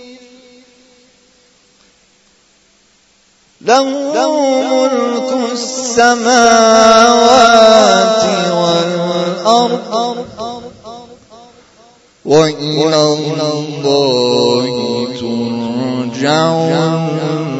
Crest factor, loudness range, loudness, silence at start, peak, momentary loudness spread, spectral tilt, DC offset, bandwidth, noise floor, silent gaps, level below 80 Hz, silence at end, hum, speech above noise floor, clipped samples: 12 dB; 10 LU; -11 LUFS; 0 s; 0 dBFS; 12 LU; -4 dB/octave; under 0.1%; 11 kHz; -52 dBFS; none; -52 dBFS; 0 s; none; 42 dB; 0.2%